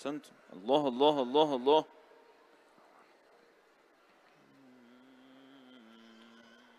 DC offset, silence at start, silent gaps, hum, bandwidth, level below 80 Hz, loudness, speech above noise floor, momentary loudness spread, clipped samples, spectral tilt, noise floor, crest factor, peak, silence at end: under 0.1%; 0 s; none; none; 11 kHz; -90 dBFS; -30 LUFS; 36 dB; 19 LU; under 0.1%; -5.5 dB/octave; -66 dBFS; 22 dB; -14 dBFS; 4.95 s